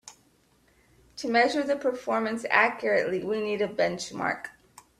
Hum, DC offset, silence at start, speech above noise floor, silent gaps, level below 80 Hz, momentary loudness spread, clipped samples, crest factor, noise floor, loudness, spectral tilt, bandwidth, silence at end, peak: none; under 0.1%; 0.05 s; 38 dB; none; -66 dBFS; 10 LU; under 0.1%; 24 dB; -64 dBFS; -26 LUFS; -4 dB/octave; 14 kHz; 0.5 s; -4 dBFS